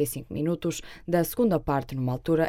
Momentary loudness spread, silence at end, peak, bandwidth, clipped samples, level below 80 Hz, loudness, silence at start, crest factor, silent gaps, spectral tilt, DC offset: 6 LU; 0 s; -10 dBFS; 16.5 kHz; under 0.1%; -48 dBFS; -28 LUFS; 0 s; 16 dB; none; -6.5 dB/octave; under 0.1%